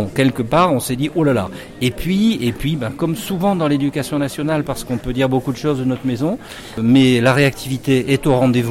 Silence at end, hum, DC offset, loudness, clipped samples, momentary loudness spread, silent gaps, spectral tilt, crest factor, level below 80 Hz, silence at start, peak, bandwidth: 0 s; none; under 0.1%; -17 LUFS; under 0.1%; 9 LU; none; -6 dB/octave; 14 dB; -40 dBFS; 0 s; -4 dBFS; 16.5 kHz